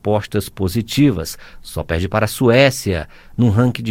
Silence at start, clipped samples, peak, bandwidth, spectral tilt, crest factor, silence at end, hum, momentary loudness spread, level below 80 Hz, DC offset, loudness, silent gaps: 0.05 s; under 0.1%; 0 dBFS; 17 kHz; -6 dB/octave; 16 dB; 0 s; none; 16 LU; -38 dBFS; under 0.1%; -17 LUFS; none